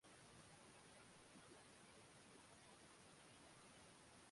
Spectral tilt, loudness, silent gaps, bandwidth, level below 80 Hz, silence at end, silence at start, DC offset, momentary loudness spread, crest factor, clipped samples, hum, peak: -3 dB/octave; -65 LUFS; none; 11.5 kHz; -84 dBFS; 0 s; 0 s; under 0.1%; 1 LU; 14 dB; under 0.1%; none; -52 dBFS